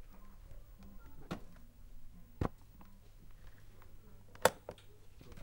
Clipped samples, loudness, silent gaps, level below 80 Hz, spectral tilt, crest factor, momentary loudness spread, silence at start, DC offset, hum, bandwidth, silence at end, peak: under 0.1%; -39 LUFS; none; -54 dBFS; -4 dB/octave; 36 dB; 27 LU; 0 s; under 0.1%; none; 16 kHz; 0 s; -8 dBFS